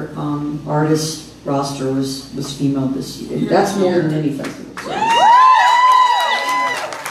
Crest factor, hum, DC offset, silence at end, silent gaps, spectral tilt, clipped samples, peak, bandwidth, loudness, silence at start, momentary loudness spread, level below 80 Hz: 14 dB; none; under 0.1%; 0 s; none; -4.5 dB/octave; under 0.1%; -2 dBFS; 14.5 kHz; -15 LUFS; 0 s; 15 LU; -50 dBFS